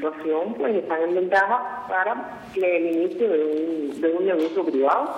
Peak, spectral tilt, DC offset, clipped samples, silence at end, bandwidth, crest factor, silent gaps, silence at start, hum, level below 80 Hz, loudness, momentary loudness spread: -8 dBFS; -6 dB/octave; under 0.1%; under 0.1%; 0 s; 10.5 kHz; 14 dB; none; 0 s; none; -68 dBFS; -23 LUFS; 6 LU